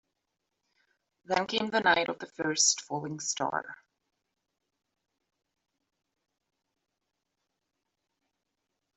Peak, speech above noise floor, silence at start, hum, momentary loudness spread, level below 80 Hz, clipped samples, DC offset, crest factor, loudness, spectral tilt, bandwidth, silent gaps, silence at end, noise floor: -10 dBFS; 54 dB; 1.3 s; none; 11 LU; -76 dBFS; under 0.1%; under 0.1%; 26 dB; -29 LUFS; -1.5 dB/octave; 8.2 kHz; none; 5.2 s; -84 dBFS